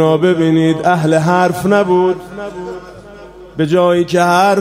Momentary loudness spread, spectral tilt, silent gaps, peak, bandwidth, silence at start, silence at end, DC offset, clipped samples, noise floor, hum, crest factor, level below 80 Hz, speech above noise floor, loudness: 15 LU; -6.5 dB/octave; none; 0 dBFS; 16 kHz; 0 s; 0 s; under 0.1%; under 0.1%; -35 dBFS; none; 12 dB; -48 dBFS; 22 dB; -12 LUFS